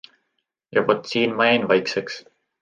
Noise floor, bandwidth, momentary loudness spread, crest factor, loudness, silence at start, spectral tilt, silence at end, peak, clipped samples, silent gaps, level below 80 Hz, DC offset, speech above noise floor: -76 dBFS; 9 kHz; 12 LU; 20 dB; -20 LUFS; 0.75 s; -5 dB/octave; 0.4 s; -2 dBFS; under 0.1%; none; -68 dBFS; under 0.1%; 55 dB